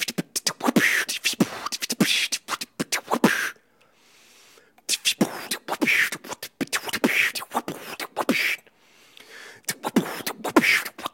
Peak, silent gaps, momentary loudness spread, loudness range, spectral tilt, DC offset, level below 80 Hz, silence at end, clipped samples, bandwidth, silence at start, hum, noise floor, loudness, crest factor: -2 dBFS; none; 12 LU; 3 LU; -2.5 dB/octave; under 0.1%; -70 dBFS; 0.05 s; under 0.1%; 17 kHz; 0 s; none; -60 dBFS; -24 LUFS; 24 dB